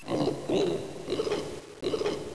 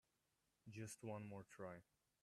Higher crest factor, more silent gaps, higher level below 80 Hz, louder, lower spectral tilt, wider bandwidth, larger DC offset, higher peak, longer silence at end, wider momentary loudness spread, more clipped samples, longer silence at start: second, 14 dB vs 20 dB; neither; first, -56 dBFS vs -86 dBFS; first, -31 LUFS vs -56 LUFS; about the same, -5.5 dB/octave vs -5.5 dB/octave; second, 11 kHz vs 13.5 kHz; first, 0.4% vs under 0.1%; first, -16 dBFS vs -38 dBFS; second, 0 s vs 0.4 s; second, 7 LU vs 10 LU; neither; second, 0 s vs 0.65 s